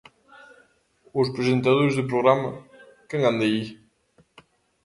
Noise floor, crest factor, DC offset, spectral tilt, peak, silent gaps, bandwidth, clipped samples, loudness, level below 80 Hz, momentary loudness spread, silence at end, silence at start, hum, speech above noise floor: -62 dBFS; 22 dB; under 0.1%; -7 dB/octave; -4 dBFS; none; 11.5 kHz; under 0.1%; -23 LUFS; -62 dBFS; 12 LU; 1.1 s; 1.15 s; none; 41 dB